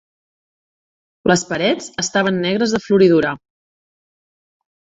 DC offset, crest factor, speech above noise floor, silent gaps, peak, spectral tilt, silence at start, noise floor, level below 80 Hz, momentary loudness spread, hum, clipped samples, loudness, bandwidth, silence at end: under 0.1%; 18 dB; over 74 dB; none; -2 dBFS; -4.5 dB/octave; 1.25 s; under -90 dBFS; -54 dBFS; 9 LU; none; under 0.1%; -17 LUFS; 8 kHz; 1.5 s